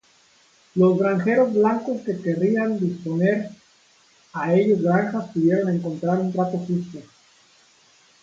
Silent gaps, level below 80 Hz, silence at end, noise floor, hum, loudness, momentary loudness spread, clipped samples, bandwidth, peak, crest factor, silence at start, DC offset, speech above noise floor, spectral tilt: none; -66 dBFS; 1.2 s; -57 dBFS; none; -22 LUFS; 9 LU; under 0.1%; 7.6 kHz; -4 dBFS; 18 dB; 0.75 s; under 0.1%; 37 dB; -8.5 dB/octave